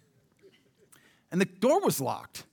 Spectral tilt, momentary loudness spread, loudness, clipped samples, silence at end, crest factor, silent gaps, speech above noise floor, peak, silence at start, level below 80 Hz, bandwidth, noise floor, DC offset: -5 dB/octave; 10 LU; -28 LUFS; under 0.1%; 0.1 s; 18 dB; none; 34 dB; -12 dBFS; 1.3 s; -78 dBFS; over 20 kHz; -62 dBFS; under 0.1%